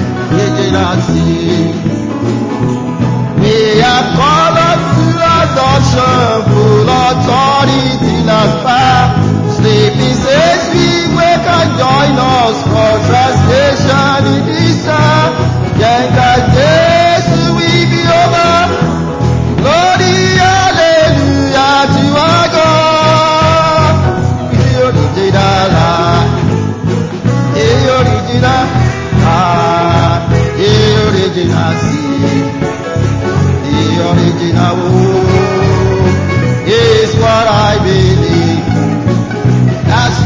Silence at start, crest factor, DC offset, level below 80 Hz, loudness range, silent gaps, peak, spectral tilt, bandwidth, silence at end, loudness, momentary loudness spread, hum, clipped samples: 0 s; 8 dB; under 0.1%; -26 dBFS; 3 LU; none; 0 dBFS; -6 dB/octave; 7.6 kHz; 0 s; -9 LUFS; 5 LU; none; 0.2%